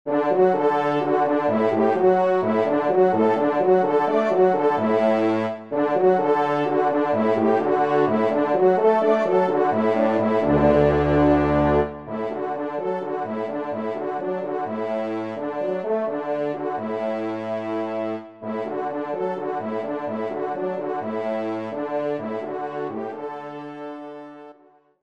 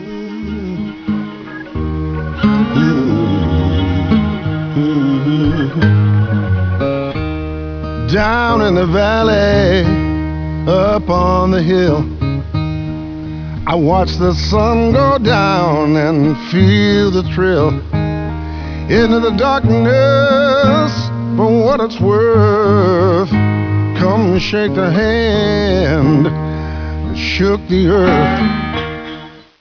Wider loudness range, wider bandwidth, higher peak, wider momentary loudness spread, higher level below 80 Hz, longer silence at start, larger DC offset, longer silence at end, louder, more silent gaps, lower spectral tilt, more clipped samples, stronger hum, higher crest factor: first, 8 LU vs 3 LU; first, 7.4 kHz vs 5.4 kHz; second, -6 dBFS vs 0 dBFS; about the same, 11 LU vs 11 LU; second, -46 dBFS vs -26 dBFS; about the same, 0.05 s vs 0 s; first, 0.1% vs under 0.1%; first, 0.5 s vs 0.2 s; second, -22 LUFS vs -14 LUFS; neither; about the same, -8.5 dB/octave vs -7.5 dB/octave; neither; neither; about the same, 16 dB vs 12 dB